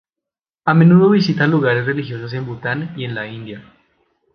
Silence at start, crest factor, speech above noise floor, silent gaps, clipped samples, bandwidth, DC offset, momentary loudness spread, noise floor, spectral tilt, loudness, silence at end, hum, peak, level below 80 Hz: 0.65 s; 16 dB; 70 dB; none; under 0.1%; 6.6 kHz; under 0.1%; 18 LU; -86 dBFS; -8.5 dB/octave; -16 LUFS; 0.75 s; none; 0 dBFS; -56 dBFS